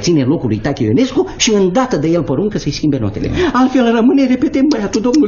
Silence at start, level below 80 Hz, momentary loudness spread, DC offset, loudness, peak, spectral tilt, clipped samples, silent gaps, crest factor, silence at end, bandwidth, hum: 0 s; -36 dBFS; 5 LU; under 0.1%; -14 LUFS; 0 dBFS; -5.5 dB/octave; under 0.1%; none; 12 dB; 0 s; 7.4 kHz; none